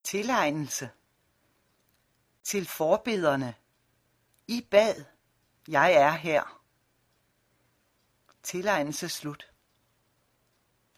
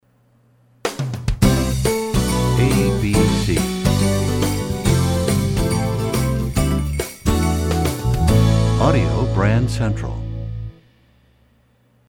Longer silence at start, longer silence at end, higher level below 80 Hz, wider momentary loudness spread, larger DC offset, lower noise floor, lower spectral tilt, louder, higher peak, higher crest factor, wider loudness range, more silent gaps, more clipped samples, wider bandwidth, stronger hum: second, 0.05 s vs 0.85 s; first, 1.55 s vs 1.4 s; second, -70 dBFS vs -28 dBFS; first, 17 LU vs 9 LU; neither; first, -71 dBFS vs -57 dBFS; second, -4 dB/octave vs -6 dB/octave; second, -27 LUFS vs -19 LUFS; second, -8 dBFS vs -2 dBFS; first, 22 dB vs 16 dB; first, 8 LU vs 2 LU; neither; neither; second, 15.5 kHz vs 17.5 kHz; neither